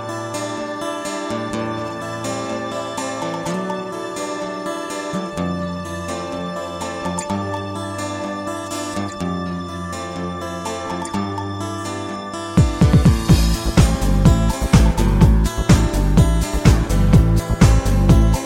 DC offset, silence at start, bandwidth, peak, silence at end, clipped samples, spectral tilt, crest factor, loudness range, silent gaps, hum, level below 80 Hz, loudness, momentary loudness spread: under 0.1%; 0 s; 16 kHz; 0 dBFS; 0 s; under 0.1%; -6 dB/octave; 18 dB; 10 LU; none; none; -22 dBFS; -20 LUFS; 12 LU